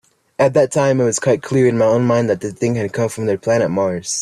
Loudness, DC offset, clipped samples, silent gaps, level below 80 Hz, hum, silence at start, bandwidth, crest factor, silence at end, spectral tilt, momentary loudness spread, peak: -16 LUFS; under 0.1%; under 0.1%; none; -54 dBFS; none; 0.4 s; 13 kHz; 14 dB; 0 s; -5.5 dB/octave; 6 LU; -2 dBFS